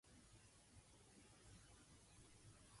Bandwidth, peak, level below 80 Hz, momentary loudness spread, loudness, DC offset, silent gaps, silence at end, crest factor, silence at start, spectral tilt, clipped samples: 11.5 kHz; -52 dBFS; -76 dBFS; 2 LU; -67 LUFS; under 0.1%; none; 0 s; 14 dB; 0.05 s; -3.5 dB/octave; under 0.1%